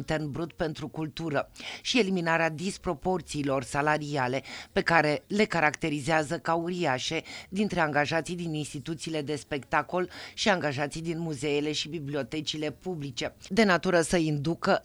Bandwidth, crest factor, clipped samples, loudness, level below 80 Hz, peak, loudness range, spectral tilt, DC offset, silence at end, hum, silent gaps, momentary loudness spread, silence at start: over 20 kHz; 22 dB; under 0.1%; -29 LUFS; -54 dBFS; -6 dBFS; 3 LU; -4.5 dB/octave; under 0.1%; 0 s; none; none; 10 LU; 0 s